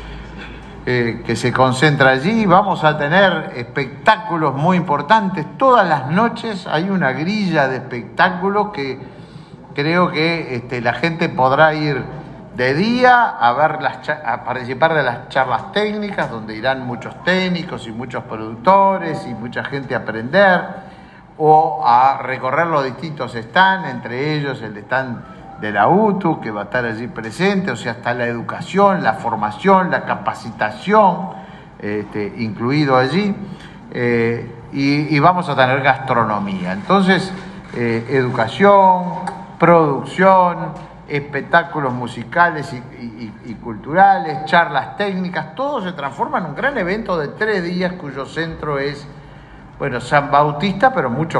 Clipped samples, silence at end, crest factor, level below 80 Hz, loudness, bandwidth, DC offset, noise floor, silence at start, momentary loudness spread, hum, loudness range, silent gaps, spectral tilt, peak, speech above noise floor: under 0.1%; 0 s; 16 dB; -48 dBFS; -17 LUFS; 11 kHz; under 0.1%; -40 dBFS; 0 s; 15 LU; none; 5 LU; none; -6.5 dB/octave; 0 dBFS; 23 dB